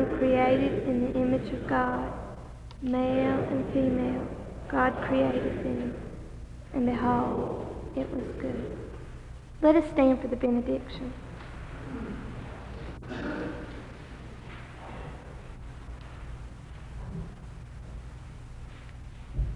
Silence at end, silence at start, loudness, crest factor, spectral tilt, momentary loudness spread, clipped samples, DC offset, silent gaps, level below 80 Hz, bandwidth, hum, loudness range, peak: 0 s; 0 s; -29 LUFS; 22 dB; -8 dB/octave; 20 LU; under 0.1%; under 0.1%; none; -44 dBFS; 10 kHz; 60 Hz at -50 dBFS; 15 LU; -8 dBFS